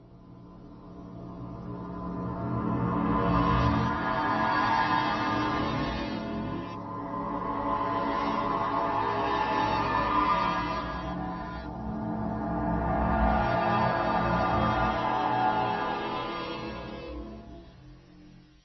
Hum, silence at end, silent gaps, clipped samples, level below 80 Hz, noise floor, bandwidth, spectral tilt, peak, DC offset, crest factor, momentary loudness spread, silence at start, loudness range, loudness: none; 0.3 s; none; under 0.1%; -42 dBFS; -53 dBFS; 6.2 kHz; -7.5 dB/octave; -12 dBFS; under 0.1%; 18 dB; 14 LU; 0 s; 4 LU; -29 LUFS